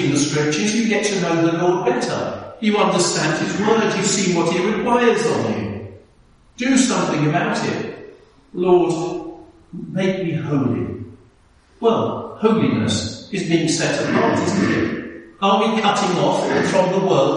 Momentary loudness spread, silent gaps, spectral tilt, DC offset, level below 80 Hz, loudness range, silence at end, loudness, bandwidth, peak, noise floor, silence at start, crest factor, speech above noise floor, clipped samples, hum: 11 LU; none; -4.5 dB/octave; under 0.1%; -54 dBFS; 4 LU; 0 s; -19 LUFS; 11 kHz; -2 dBFS; -53 dBFS; 0 s; 18 dB; 35 dB; under 0.1%; none